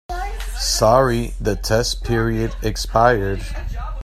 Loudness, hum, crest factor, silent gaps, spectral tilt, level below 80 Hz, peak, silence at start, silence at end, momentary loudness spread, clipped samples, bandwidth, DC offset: -19 LUFS; none; 18 dB; none; -4.5 dB/octave; -28 dBFS; 0 dBFS; 0.1 s; 0 s; 14 LU; under 0.1%; 15.5 kHz; under 0.1%